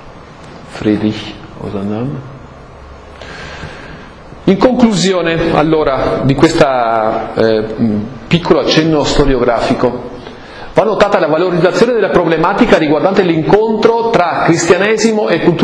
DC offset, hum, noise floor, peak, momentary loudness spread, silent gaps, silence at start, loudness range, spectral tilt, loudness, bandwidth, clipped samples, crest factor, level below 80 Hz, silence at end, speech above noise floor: under 0.1%; none; -33 dBFS; 0 dBFS; 18 LU; none; 0 s; 10 LU; -5.5 dB/octave; -12 LUFS; 11 kHz; 0.5%; 12 dB; -30 dBFS; 0 s; 22 dB